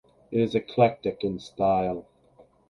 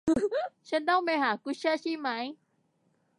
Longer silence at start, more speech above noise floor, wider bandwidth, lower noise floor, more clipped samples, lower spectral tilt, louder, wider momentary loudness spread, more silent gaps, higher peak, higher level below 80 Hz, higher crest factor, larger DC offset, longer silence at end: first, 0.3 s vs 0.05 s; second, 33 dB vs 43 dB; about the same, 11 kHz vs 11 kHz; second, -58 dBFS vs -72 dBFS; neither; first, -7.5 dB/octave vs -4.5 dB/octave; first, -26 LUFS vs -30 LUFS; about the same, 9 LU vs 8 LU; neither; first, -6 dBFS vs -14 dBFS; first, -56 dBFS vs -64 dBFS; about the same, 20 dB vs 16 dB; neither; second, 0.7 s vs 0.85 s